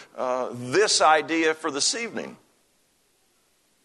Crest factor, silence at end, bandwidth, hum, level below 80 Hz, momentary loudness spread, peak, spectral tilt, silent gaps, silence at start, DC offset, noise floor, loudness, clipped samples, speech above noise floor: 20 dB; 1.5 s; 12.5 kHz; none; -74 dBFS; 14 LU; -6 dBFS; -2 dB/octave; none; 0 s; under 0.1%; -66 dBFS; -22 LUFS; under 0.1%; 43 dB